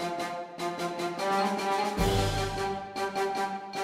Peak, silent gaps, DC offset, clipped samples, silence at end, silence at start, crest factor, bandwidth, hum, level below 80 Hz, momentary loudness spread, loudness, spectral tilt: -14 dBFS; none; under 0.1%; under 0.1%; 0 s; 0 s; 16 dB; 16 kHz; none; -44 dBFS; 7 LU; -30 LUFS; -4.5 dB/octave